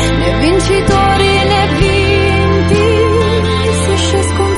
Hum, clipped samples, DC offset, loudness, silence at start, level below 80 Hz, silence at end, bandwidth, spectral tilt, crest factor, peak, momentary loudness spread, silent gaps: none; under 0.1%; under 0.1%; -11 LUFS; 0 s; -22 dBFS; 0 s; 11.5 kHz; -5.5 dB/octave; 10 dB; 0 dBFS; 3 LU; none